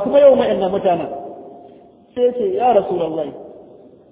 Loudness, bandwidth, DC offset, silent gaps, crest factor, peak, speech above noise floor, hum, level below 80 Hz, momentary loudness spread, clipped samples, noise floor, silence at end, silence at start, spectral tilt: -16 LUFS; 3.9 kHz; under 0.1%; none; 18 dB; 0 dBFS; 29 dB; none; -54 dBFS; 21 LU; under 0.1%; -44 dBFS; 0.5 s; 0 s; -10 dB/octave